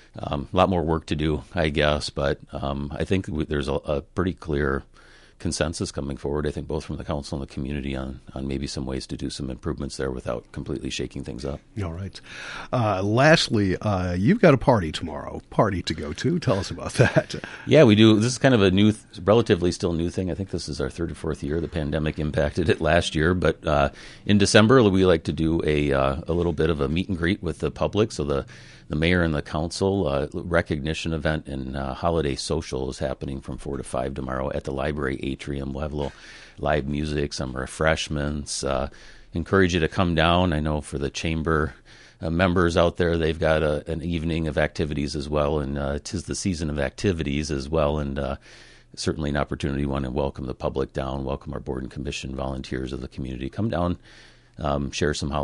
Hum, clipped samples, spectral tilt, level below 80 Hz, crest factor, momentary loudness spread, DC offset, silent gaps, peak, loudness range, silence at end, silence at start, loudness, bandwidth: none; under 0.1%; -6 dB/octave; -36 dBFS; 22 dB; 12 LU; under 0.1%; none; -2 dBFS; 10 LU; 0 s; 0.15 s; -24 LUFS; 11.5 kHz